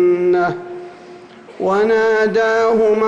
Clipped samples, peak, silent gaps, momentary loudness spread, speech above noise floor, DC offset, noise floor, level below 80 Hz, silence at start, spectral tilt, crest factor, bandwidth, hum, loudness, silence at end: under 0.1%; -6 dBFS; none; 17 LU; 24 dB; under 0.1%; -38 dBFS; -54 dBFS; 0 s; -6 dB/octave; 8 dB; 7.8 kHz; none; -15 LUFS; 0 s